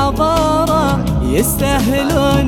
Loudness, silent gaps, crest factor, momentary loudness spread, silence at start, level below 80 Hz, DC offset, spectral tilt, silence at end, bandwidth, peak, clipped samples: -14 LUFS; none; 12 dB; 2 LU; 0 s; -24 dBFS; under 0.1%; -5.5 dB/octave; 0 s; 19 kHz; -2 dBFS; under 0.1%